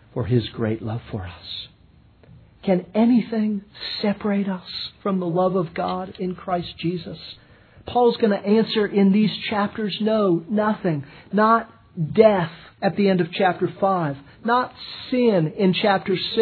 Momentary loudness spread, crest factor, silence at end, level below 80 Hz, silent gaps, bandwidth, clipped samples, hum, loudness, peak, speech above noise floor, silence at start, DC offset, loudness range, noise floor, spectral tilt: 13 LU; 20 dB; 0 s; -56 dBFS; none; 4.6 kHz; under 0.1%; none; -22 LUFS; -2 dBFS; 32 dB; 0.15 s; under 0.1%; 4 LU; -53 dBFS; -9.5 dB/octave